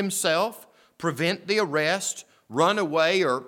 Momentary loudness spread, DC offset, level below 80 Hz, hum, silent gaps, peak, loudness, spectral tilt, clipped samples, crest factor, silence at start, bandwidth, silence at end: 9 LU; under 0.1%; -78 dBFS; none; none; -8 dBFS; -24 LUFS; -3.5 dB/octave; under 0.1%; 18 dB; 0 s; 18 kHz; 0 s